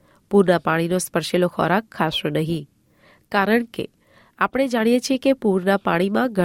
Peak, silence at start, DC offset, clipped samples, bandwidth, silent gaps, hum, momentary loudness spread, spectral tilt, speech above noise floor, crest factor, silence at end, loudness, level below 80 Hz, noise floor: -4 dBFS; 0.3 s; under 0.1%; under 0.1%; 16.5 kHz; none; none; 6 LU; -5.5 dB/octave; 36 dB; 16 dB; 0 s; -20 LUFS; -56 dBFS; -56 dBFS